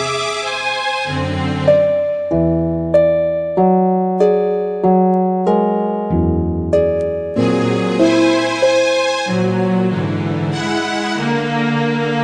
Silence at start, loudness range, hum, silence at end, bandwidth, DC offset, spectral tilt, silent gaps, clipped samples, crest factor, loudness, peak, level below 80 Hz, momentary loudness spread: 0 s; 2 LU; none; 0 s; 10.5 kHz; under 0.1%; -6 dB/octave; none; under 0.1%; 14 dB; -16 LUFS; -2 dBFS; -38 dBFS; 6 LU